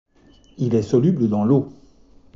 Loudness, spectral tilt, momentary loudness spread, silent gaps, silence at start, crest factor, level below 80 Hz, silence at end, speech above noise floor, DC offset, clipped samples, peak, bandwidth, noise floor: -19 LUFS; -10 dB/octave; 8 LU; none; 0.6 s; 16 dB; -54 dBFS; 0.65 s; 34 dB; under 0.1%; under 0.1%; -6 dBFS; 7.6 kHz; -52 dBFS